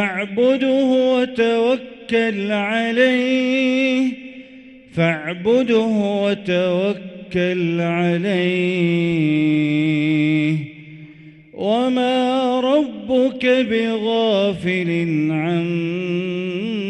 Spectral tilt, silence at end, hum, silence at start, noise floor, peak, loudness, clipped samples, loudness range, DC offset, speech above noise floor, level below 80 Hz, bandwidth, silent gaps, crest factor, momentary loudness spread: -7 dB/octave; 0 s; none; 0 s; -42 dBFS; -4 dBFS; -18 LUFS; under 0.1%; 2 LU; under 0.1%; 24 dB; -58 dBFS; 9.2 kHz; none; 14 dB; 6 LU